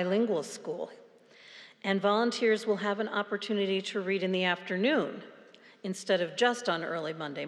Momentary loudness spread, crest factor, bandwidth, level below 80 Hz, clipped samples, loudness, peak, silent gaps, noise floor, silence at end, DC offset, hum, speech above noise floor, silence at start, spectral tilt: 12 LU; 18 dB; 12.5 kHz; under -90 dBFS; under 0.1%; -30 LUFS; -14 dBFS; none; -56 dBFS; 0 s; under 0.1%; none; 26 dB; 0 s; -4.5 dB/octave